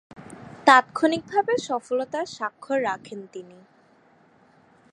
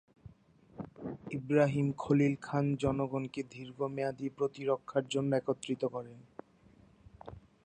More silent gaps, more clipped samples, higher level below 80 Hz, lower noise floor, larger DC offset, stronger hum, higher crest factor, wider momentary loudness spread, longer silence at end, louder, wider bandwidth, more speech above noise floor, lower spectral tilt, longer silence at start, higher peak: neither; neither; second, -70 dBFS vs -62 dBFS; second, -58 dBFS vs -62 dBFS; neither; neither; about the same, 24 dB vs 20 dB; first, 25 LU vs 22 LU; first, 1.5 s vs 0.25 s; first, -23 LUFS vs -34 LUFS; first, 11.5 kHz vs 9.6 kHz; first, 34 dB vs 30 dB; second, -3.5 dB/octave vs -7 dB/octave; about the same, 0.25 s vs 0.25 s; first, -2 dBFS vs -14 dBFS